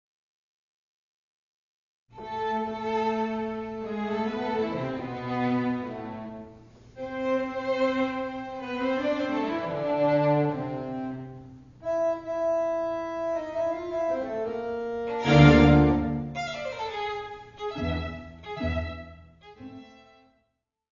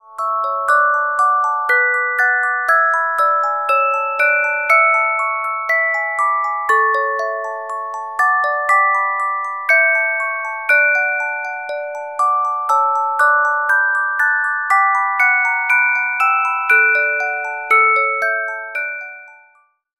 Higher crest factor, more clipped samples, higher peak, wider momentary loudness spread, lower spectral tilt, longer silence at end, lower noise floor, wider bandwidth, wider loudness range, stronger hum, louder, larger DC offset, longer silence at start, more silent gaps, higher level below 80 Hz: first, 24 dB vs 16 dB; neither; about the same, -4 dBFS vs -2 dBFS; first, 16 LU vs 10 LU; first, -7.5 dB/octave vs 0.5 dB/octave; first, 1.05 s vs 0.65 s; first, -78 dBFS vs -55 dBFS; second, 7.4 kHz vs 16.5 kHz; first, 11 LU vs 3 LU; neither; second, -27 LUFS vs -15 LUFS; second, under 0.1% vs 0.1%; first, 2.15 s vs 0.1 s; neither; first, -44 dBFS vs -76 dBFS